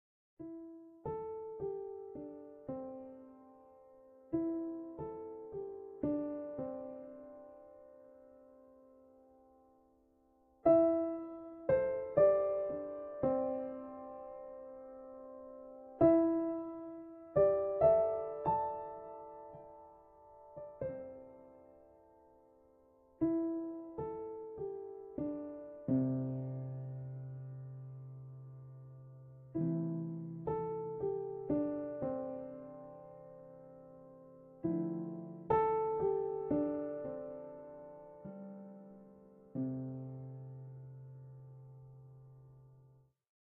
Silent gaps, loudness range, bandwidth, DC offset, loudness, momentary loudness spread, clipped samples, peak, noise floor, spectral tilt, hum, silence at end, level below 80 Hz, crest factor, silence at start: none; 14 LU; 3.6 kHz; under 0.1%; -37 LUFS; 24 LU; under 0.1%; -16 dBFS; -70 dBFS; -10.5 dB/octave; none; 0.55 s; -68 dBFS; 22 dB; 0.4 s